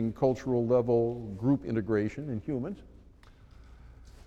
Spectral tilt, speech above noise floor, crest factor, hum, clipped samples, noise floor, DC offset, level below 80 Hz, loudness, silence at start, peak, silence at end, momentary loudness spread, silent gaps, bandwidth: -9 dB/octave; 26 dB; 18 dB; none; under 0.1%; -55 dBFS; under 0.1%; -54 dBFS; -30 LUFS; 0 s; -14 dBFS; 0.05 s; 10 LU; none; 8.2 kHz